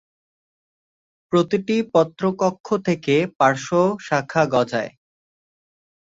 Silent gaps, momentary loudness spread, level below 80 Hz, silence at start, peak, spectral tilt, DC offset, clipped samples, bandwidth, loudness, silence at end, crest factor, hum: 2.60-2.64 s; 5 LU; -62 dBFS; 1.3 s; -2 dBFS; -6 dB/octave; under 0.1%; under 0.1%; 7.8 kHz; -20 LUFS; 1.25 s; 20 dB; none